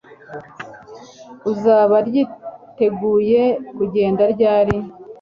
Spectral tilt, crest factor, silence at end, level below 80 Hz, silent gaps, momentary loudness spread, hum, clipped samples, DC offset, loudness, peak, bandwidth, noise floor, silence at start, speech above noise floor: -8 dB/octave; 18 dB; 0.05 s; -50 dBFS; none; 21 LU; none; under 0.1%; under 0.1%; -17 LUFS; 0 dBFS; 7 kHz; -40 dBFS; 0.1 s; 23 dB